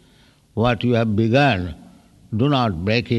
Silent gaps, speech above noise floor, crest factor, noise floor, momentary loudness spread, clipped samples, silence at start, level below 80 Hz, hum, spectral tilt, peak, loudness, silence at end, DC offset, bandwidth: none; 35 dB; 16 dB; -54 dBFS; 12 LU; under 0.1%; 0.55 s; -44 dBFS; none; -7.5 dB/octave; -4 dBFS; -19 LUFS; 0 s; under 0.1%; 8.8 kHz